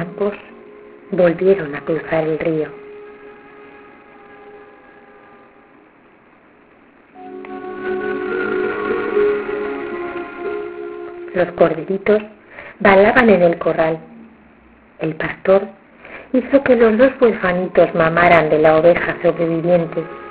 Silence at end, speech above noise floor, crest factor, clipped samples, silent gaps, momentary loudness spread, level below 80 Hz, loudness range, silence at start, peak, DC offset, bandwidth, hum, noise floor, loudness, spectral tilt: 0 s; 34 dB; 18 dB; under 0.1%; none; 19 LU; -48 dBFS; 12 LU; 0 s; 0 dBFS; under 0.1%; 4 kHz; none; -49 dBFS; -16 LUFS; -10 dB/octave